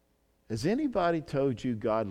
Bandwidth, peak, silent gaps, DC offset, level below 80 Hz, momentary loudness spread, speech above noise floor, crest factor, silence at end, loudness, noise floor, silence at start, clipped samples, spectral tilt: 14 kHz; -16 dBFS; none; under 0.1%; -58 dBFS; 5 LU; 40 dB; 14 dB; 0 s; -30 LUFS; -69 dBFS; 0.5 s; under 0.1%; -7 dB/octave